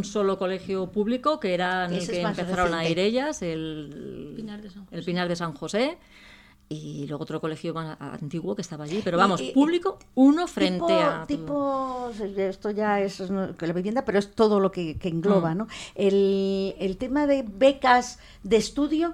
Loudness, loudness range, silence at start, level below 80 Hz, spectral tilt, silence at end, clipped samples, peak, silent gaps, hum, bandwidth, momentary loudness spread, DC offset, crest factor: -25 LUFS; 8 LU; 0 s; -52 dBFS; -5.5 dB/octave; 0 s; under 0.1%; -6 dBFS; none; none; 12.5 kHz; 14 LU; under 0.1%; 20 dB